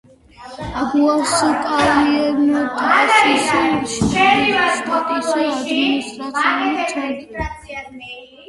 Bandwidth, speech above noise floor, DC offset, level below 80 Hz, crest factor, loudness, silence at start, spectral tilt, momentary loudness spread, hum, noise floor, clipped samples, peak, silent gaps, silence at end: 11.5 kHz; 22 dB; under 0.1%; -42 dBFS; 16 dB; -16 LUFS; 0.4 s; -3.5 dB/octave; 15 LU; none; -39 dBFS; under 0.1%; 0 dBFS; none; 0.05 s